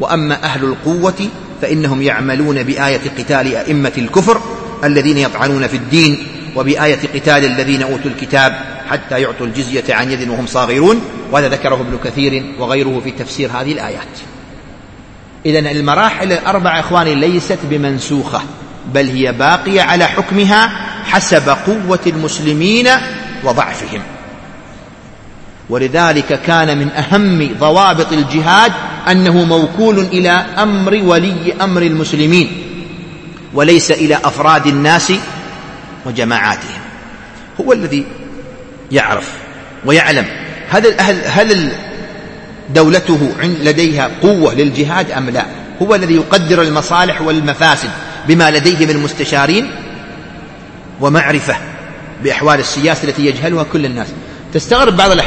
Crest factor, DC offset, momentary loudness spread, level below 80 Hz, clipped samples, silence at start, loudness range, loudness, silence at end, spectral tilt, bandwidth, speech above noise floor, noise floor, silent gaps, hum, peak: 12 dB; under 0.1%; 17 LU; -40 dBFS; 0.2%; 0 s; 5 LU; -12 LUFS; 0 s; -5 dB/octave; 11 kHz; 23 dB; -35 dBFS; none; none; 0 dBFS